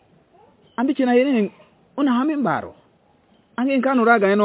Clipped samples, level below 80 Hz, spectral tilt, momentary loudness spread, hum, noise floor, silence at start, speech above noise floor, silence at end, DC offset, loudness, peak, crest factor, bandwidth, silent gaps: under 0.1%; -66 dBFS; -10 dB/octave; 18 LU; none; -58 dBFS; 0.8 s; 40 dB; 0 s; under 0.1%; -19 LUFS; -2 dBFS; 18 dB; 4 kHz; none